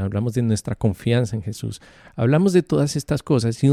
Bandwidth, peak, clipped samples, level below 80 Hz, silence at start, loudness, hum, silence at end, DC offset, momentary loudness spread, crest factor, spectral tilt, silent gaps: 13.5 kHz; -4 dBFS; under 0.1%; -48 dBFS; 0 s; -21 LUFS; none; 0 s; under 0.1%; 13 LU; 16 dB; -7 dB/octave; none